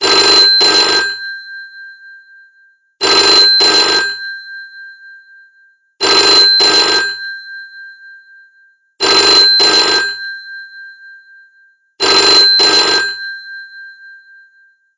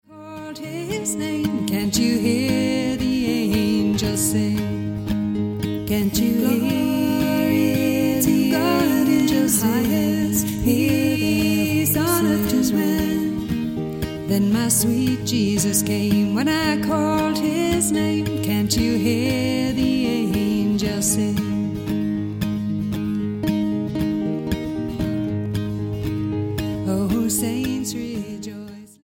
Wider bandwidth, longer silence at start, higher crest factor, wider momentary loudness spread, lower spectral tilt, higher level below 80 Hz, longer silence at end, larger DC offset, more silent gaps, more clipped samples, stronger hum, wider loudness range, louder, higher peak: second, 7.8 kHz vs 17 kHz; about the same, 0 s vs 0.1 s; about the same, 14 dB vs 14 dB; first, 23 LU vs 7 LU; second, 0 dB/octave vs -5 dB/octave; second, -54 dBFS vs -42 dBFS; first, 0.85 s vs 0.2 s; neither; neither; neither; neither; second, 0 LU vs 5 LU; first, -7 LUFS vs -21 LUFS; first, 0 dBFS vs -6 dBFS